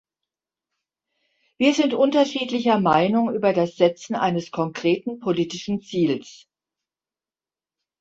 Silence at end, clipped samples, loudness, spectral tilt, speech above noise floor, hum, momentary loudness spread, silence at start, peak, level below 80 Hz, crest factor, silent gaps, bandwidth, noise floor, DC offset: 1.65 s; under 0.1%; -22 LUFS; -5.5 dB/octave; over 69 dB; none; 7 LU; 1.6 s; -4 dBFS; -64 dBFS; 20 dB; none; 8 kHz; under -90 dBFS; under 0.1%